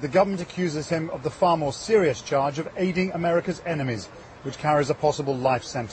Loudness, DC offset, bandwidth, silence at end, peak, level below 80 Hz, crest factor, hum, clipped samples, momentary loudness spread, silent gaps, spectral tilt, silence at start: -25 LUFS; under 0.1%; 8.8 kHz; 0 s; -8 dBFS; -54 dBFS; 16 dB; none; under 0.1%; 8 LU; none; -6 dB/octave; 0 s